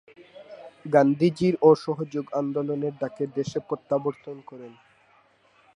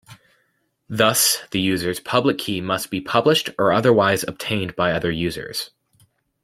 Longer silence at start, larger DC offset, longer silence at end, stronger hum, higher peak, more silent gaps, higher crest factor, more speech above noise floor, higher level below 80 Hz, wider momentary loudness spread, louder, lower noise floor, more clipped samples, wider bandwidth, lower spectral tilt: first, 0.4 s vs 0.1 s; neither; first, 1.05 s vs 0.75 s; neither; about the same, -4 dBFS vs -2 dBFS; neither; about the same, 22 dB vs 20 dB; second, 36 dB vs 48 dB; second, -68 dBFS vs -54 dBFS; first, 24 LU vs 9 LU; second, -24 LUFS vs -20 LUFS; second, -61 dBFS vs -68 dBFS; neither; second, 10.5 kHz vs 16.5 kHz; first, -7.5 dB/octave vs -3.5 dB/octave